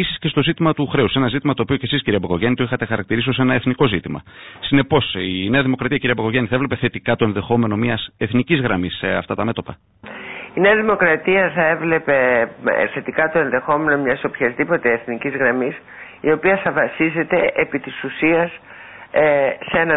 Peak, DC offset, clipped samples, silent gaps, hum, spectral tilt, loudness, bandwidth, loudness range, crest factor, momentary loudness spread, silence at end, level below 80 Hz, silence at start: -2 dBFS; under 0.1%; under 0.1%; none; none; -11.5 dB/octave; -18 LUFS; 4 kHz; 3 LU; 16 dB; 9 LU; 0 s; -46 dBFS; 0 s